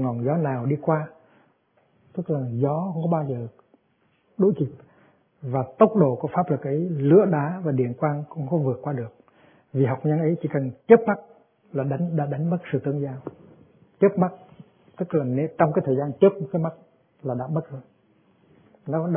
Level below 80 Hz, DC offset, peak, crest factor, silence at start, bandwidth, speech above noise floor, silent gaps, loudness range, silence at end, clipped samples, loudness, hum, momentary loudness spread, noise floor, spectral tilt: -68 dBFS; under 0.1%; -2 dBFS; 22 dB; 0 s; 3.6 kHz; 44 dB; none; 5 LU; 0 s; under 0.1%; -24 LUFS; none; 15 LU; -66 dBFS; -13 dB/octave